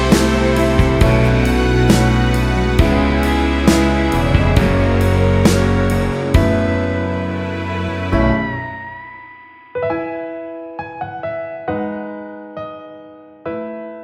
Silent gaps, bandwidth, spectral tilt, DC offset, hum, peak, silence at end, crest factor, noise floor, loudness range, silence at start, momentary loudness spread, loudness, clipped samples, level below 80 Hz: none; 16 kHz; -6.5 dB/octave; under 0.1%; none; 0 dBFS; 0 s; 16 dB; -40 dBFS; 12 LU; 0 s; 16 LU; -16 LUFS; under 0.1%; -22 dBFS